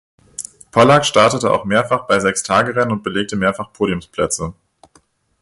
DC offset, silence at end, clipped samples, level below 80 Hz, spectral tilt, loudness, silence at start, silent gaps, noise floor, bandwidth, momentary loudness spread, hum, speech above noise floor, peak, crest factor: under 0.1%; 0.9 s; under 0.1%; -46 dBFS; -4 dB/octave; -16 LUFS; 0.4 s; none; -56 dBFS; 11.5 kHz; 15 LU; none; 40 dB; 0 dBFS; 18 dB